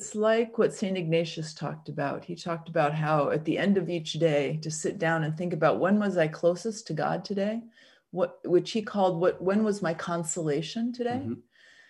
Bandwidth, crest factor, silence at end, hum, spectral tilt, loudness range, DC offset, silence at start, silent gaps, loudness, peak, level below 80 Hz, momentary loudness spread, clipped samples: 12 kHz; 18 dB; 0.5 s; none; -5.5 dB/octave; 2 LU; under 0.1%; 0 s; none; -28 LUFS; -10 dBFS; -72 dBFS; 9 LU; under 0.1%